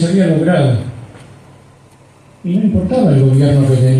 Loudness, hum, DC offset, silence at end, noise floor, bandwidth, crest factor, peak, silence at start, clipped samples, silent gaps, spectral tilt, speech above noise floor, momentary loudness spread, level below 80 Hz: -12 LUFS; none; under 0.1%; 0 s; -44 dBFS; 10.5 kHz; 12 dB; 0 dBFS; 0 s; under 0.1%; none; -8.5 dB/octave; 33 dB; 14 LU; -40 dBFS